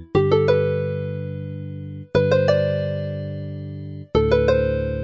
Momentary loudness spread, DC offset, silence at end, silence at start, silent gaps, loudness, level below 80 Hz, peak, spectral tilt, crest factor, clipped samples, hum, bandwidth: 15 LU; under 0.1%; 0 s; 0 s; none; -21 LUFS; -38 dBFS; -4 dBFS; -8 dB/octave; 18 dB; under 0.1%; 50 Hz at -50 dBFS; 7.2 kHz